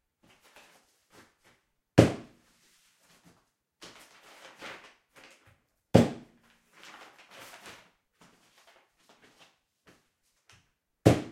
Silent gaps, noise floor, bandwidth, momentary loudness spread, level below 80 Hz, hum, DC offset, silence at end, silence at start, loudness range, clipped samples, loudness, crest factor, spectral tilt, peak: none; -74 dBFS; 15.5 kHz; 28 LU; -64 dBFS; none; under 0.1%; 0.05 s; 1.95 s; 20 LU; under 0.1%; -26 LUFS; 32 dB; -6.5 dB/octave; -2 dBFS